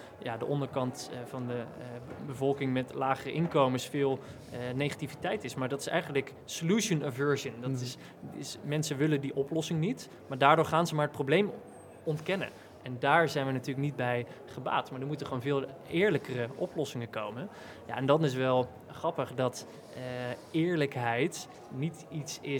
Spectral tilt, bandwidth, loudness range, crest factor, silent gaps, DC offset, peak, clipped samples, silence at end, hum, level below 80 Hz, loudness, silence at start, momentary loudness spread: -5.5 dB/octave; 19 kHz; 4 LU; 24 dB; none; under 0.1%; -8 dBFS; under 0.1%; 0 s; none; -72 dBFS; -32 LUFS; 0 s; 14 LU